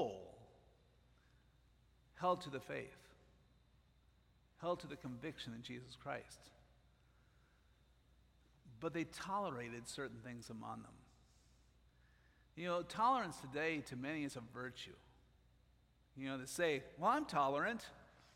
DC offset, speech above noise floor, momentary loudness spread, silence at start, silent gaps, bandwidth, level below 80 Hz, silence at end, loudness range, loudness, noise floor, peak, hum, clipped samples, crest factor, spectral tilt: under 0.1%; 29 dB; 17 LU; 0 s; none; 16 kHz; -72 dBFS; 0.15 s; 10 LU; -43 LUFS; -72 dBFS; -22 dBFS; none; under 0.1%; 22 dB; -4.5 dB/octave